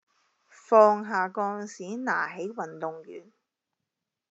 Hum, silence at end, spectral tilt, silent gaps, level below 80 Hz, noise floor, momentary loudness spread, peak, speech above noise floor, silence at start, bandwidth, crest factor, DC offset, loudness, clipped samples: none; 1.1 s; -4 dB/octave; none; under -90 dBFS; -86 dBFS; 19 LU; -6 dBFS; 60 dB; 0.7 s; 8 kHz; 22 dB; under 0.1%; -26 LUFS; under 0.1%